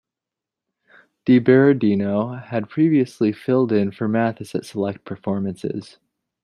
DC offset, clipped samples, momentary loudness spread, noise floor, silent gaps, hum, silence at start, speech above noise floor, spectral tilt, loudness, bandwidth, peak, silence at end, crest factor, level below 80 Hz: under 0.1%; under 0.1%; 14 LU; -87 dBFS; none; none; 1.25 s; 67 dB; -8 dB/octave; -20 LUFS; 11.5 kHz; -2 dBFS; 0.6 s; 18 dB; -64 dBFS